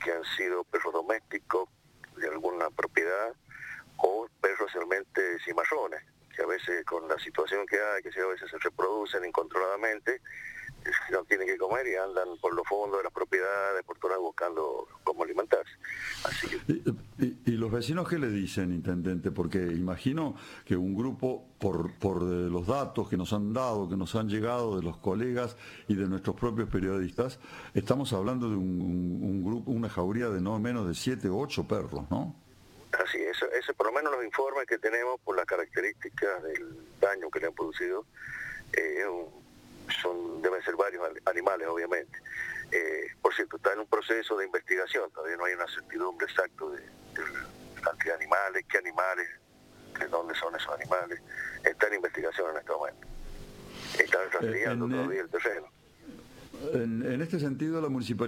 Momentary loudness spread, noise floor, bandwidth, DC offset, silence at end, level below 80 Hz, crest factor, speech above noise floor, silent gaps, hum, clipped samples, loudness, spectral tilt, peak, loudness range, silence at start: 9 LU; -55 dBFS; 16.5 kHz; under 0.1%; 0 s; -58 dBFS; 26 dB; 24 dB; none; none; under 0.1%; -31 LUFS; -6 dB/octave; -6 dBFS; 2 LU; 0 s